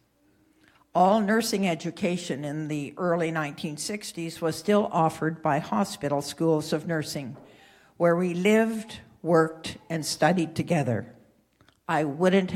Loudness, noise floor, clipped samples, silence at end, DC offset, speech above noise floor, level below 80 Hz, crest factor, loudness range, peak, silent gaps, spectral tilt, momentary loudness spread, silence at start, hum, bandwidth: -26 LUFS; -64 dBFS; under 0.1%; 0 s; under 0.1%; 39 dB; -66 dBFS; 18 dB; 3 LU; -8 dBFS; none; -5.5 dB/octave; 10 LU; 0.95 s; none; 16 kHz